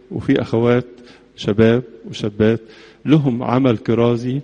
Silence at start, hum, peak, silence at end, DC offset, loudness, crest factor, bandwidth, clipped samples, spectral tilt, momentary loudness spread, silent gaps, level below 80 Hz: 0.1 s; none; 0 dBFS; 0 s; under 0.1%; -17 LUFS; 16 dB; 8.4 kHz; under 0.1%; -8 dB/octave; 11 LU; none; -48 dBFS